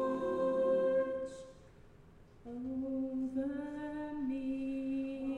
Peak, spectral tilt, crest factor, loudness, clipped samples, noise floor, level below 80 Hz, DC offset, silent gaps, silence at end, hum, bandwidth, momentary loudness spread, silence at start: -22 dBFS; -7.5 dB/octave; 14 dB; -36 LUFS; under 0.1%; -59 dBFS; -62 dBFS; under 0.1%; none; 0 s; none; 9.6 kHz; 14 LU; 0 s